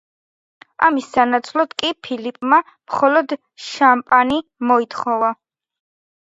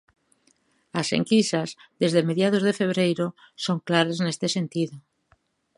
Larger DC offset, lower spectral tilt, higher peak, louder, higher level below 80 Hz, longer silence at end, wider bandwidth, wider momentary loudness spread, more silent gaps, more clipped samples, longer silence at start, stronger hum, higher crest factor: neither; second, -3.5 dB/octave vs -5 dB/octave; first, 0 dBFS vs -4 dBFS; first, -17 LUFS vs -24 LUFS; first, -62 dBFS vs -70 dBFS; first, 0.95 s vs 0.8 s; second, 8 kHz vs 11.5 kHz; about the same, 11 LU vs 9 LU; neither; neither; second, 0.8 s vs 0.95 s; neither; about the same, 18 dB vs 22 dB